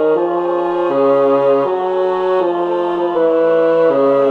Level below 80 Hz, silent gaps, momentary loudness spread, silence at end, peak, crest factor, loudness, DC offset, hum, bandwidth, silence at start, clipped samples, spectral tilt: -58 dBFS; none; 4 LU; 0 s; -4 dBFS; 10 dB; -14 LUFS; under 0.1%; none; 5.6 kHz; 0 s; under 0.1%; -7.5 dB/octave